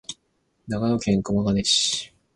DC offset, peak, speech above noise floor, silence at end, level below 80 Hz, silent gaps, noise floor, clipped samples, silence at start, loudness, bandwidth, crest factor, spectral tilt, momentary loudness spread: under 0.1%; -8 dBFS; 47 dB; 0.3 s; -48 dBFS; none; -70 dBFS; under 0.1%; 0.1 s; -22 LUFS; 11.5 kHz; 16 dB; -4 dB/octave; 15 LU